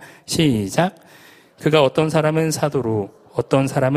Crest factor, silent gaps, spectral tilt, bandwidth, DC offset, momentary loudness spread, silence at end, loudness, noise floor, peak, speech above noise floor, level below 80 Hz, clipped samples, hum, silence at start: 18 dB; none; -5.5 dB/octave; 15.5 kHz; under 0.1%; 9 LU; 0 s; -19 LUFS; -47 dBFS; 0 dBFS; 30 dB; -52 dBFS; under 0.1%; none; 0 s